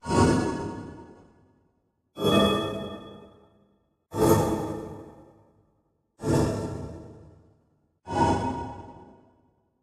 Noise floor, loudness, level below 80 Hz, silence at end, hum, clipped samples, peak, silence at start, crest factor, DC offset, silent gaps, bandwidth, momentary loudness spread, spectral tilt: -71 dBFS; -26 LUFS; -46 dBFS; 0.8 s; none; under 0.1%; -8 dBFS; 0.05 s; 20 dB; under 0.1%; none; 15 kHz; 23 LU; -6 dB/octave